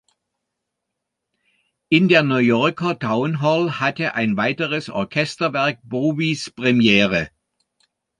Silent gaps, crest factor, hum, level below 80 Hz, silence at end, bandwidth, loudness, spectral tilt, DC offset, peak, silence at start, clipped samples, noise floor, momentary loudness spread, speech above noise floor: none; 20 dB; none; -56 dBFS; 0.9 s; 10.5 kHz; -19 LUFS; -6 dB/octave; under 0.1%; -2 dBFS; 1.9 s; under 0.1%; -80 dBFS; 8 LU; 61 dB